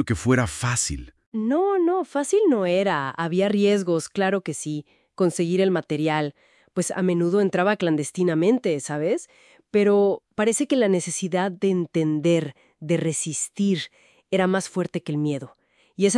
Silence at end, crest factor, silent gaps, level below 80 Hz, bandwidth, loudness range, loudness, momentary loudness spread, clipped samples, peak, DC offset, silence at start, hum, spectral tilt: 0 s; 18 dB; 1.26-1.32 s; -52 dBFS; 12 kHz; 3 LU; -23 LUFS; 8 LU; under 0.1%; -6 dBFS; under 0.1%; 0 s; none; -5 dB/octave